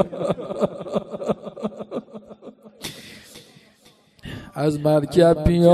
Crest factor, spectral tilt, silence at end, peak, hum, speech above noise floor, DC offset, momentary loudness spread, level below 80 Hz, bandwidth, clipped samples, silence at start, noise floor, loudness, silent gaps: 20 dB; -7.5 dB/octave; 0 s; -2 dBFS; none; 37 dB; under 0.1%; 25 LU; -40 dBFS; 13.5 kHz; under 0.1%; 0 s; -55 dBFS; -22 LUFS; none